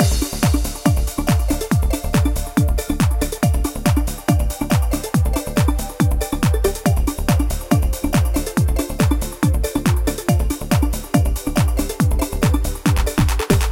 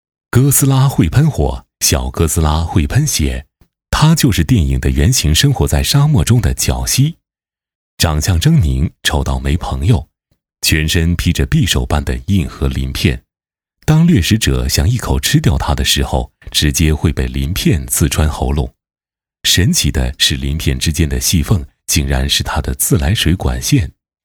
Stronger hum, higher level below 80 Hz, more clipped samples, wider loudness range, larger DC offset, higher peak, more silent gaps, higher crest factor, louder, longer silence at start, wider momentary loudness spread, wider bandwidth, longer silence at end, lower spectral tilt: neither; about the same, -22 dBFS vs -22 dBFS; neither; second, 0 LU vs 3 LU; neither; about the same, 0 dBFS vs 0 dBFS; second, none vs 7.75-7.97 s; about the same, 18 dB vs 14 dB; second, -19 LUFS vs -14 LUFS; second, 0 s vs 0.35 s; second, 1 LU vs 7 LU; second, 17 kHz vs over 20 kHz; second, 0 s vs 0.35 s; about the same, -5.5 dB/octave vs -4.5 dB/octave